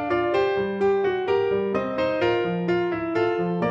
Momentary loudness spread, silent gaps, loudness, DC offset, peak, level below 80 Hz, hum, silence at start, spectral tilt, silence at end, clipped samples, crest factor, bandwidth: 2 LU; none; -23 LUFS; under 0.1%; -10 dBFS; -56 dBFS; none; 0 s; -7.5 dB/octave; 0 s; under 0.1%; 12 dB; 7.2 kHz